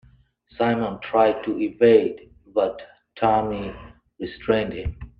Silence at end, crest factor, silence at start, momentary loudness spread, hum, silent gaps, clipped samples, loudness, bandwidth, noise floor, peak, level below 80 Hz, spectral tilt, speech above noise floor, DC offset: 0.1 s; 20 dB; 0.6 s; 19 LU; none; none; under 0.1%; -22 LUFS; 5 kHz; -56 dBFS; -4 dBFS; -46 dBFS; -9 dB/octave; 34 dB; under 0.1%